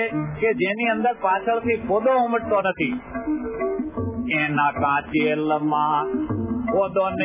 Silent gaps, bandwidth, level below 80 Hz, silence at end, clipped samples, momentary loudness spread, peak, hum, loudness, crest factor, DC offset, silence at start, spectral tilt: none; 3.8 kHz; -46 dBFS; 0 s; under 0.1%; 6 LU; -8 dBFS; none; -22 LUFS; 14 dB; under 0.1%; 0 s; -10 dB/octave